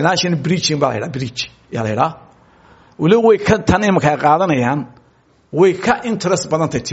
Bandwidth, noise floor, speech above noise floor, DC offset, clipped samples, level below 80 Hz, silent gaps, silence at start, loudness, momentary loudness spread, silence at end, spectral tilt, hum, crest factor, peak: 8 kHz; -54 dBFS; 38 dB; under 0.1%; under 0.1%; -42 dBFS; none; 0 s; -16 LUFS; 11 LU; 0 s; -4.5 dB/octave; none; 16 dB; 0 dBFS